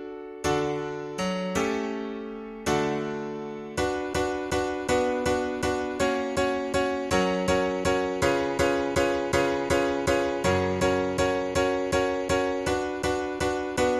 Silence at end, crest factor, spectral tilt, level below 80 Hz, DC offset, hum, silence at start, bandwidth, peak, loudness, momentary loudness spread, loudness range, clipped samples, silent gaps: 0 s; 18 dB; -4.5 dB/octave; -46 dBFS; under 0.1%; none; 0 s; 14.5 kHz; -10 dBFS; -27 LUFS; 7 LU; 4 LU; under 0.1%; none